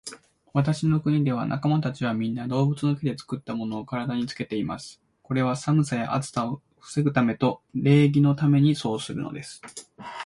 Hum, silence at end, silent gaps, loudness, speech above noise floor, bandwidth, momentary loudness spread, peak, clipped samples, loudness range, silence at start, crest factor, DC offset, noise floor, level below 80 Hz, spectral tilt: none; 0 s; none; -25 LUFS; 20 dB; 11.5 kHz; 15 LU; -6 dBFS; under 0.1%; 5 LU; 0.05 s; 18 dB; under 0.1%; -44 dBFS; -58 dBFS; -7 dB/octave